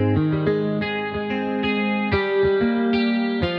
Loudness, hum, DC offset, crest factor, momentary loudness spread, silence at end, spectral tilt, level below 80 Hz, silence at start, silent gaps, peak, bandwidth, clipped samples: -21 LUFS; none; under 0.1%; 12 dB; 5 LU; 0 s; -9 dB/octave; -44 dBFS; 0 s; none; -8 dBFS; 5.6 kHz; under 0.1%